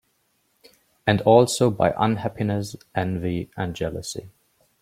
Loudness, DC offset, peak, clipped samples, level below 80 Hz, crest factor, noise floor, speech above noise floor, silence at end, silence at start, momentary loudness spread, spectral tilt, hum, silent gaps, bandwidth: -22 LUFS; under 0.1%; -2 dBFS; under 0.1%; -52 dBFS; 22 dB; -68 dBFS; 47 dB; 0.5 s; 1.05 s; 14 LU; -5.5 dB/octave; none; none; 16 kHz